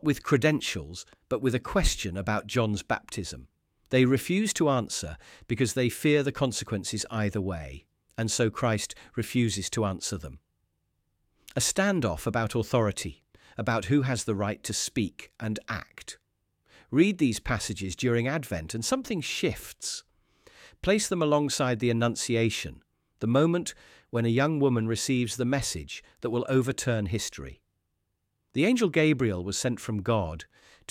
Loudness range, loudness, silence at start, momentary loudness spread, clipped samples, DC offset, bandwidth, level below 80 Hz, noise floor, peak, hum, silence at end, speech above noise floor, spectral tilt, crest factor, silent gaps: 3 LU; -28 LUFS; 0.05 s; 12 LU; under 0.1%; under 0.1%; 16.5 kHz; -46 dBFS; -78 dBFS; -8 dBFS; none; 0.45 s; 51 dB; -5 dB/octave; 20 dB; none